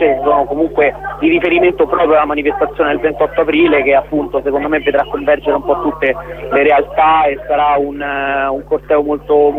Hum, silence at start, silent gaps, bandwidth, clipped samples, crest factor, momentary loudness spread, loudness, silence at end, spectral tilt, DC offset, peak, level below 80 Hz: none; 0 s; none; 4.1 kHz; under 0.1%; 12 dB; 6 LU; -13 LUFS; 0 s; -7.5 dB/octave; under 0.1%; 0 dBFS; -38 dBFS